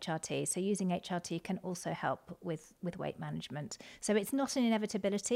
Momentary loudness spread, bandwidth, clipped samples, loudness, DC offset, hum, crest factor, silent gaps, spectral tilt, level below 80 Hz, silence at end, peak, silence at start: 10 LU; 16.5 kHz; under 0.1%; -36 LUFS; under 0.1%; none; 16 dB; none; -4.5 dB/octave; -72 dBFS; 0 s; -20 dBFS; 0 s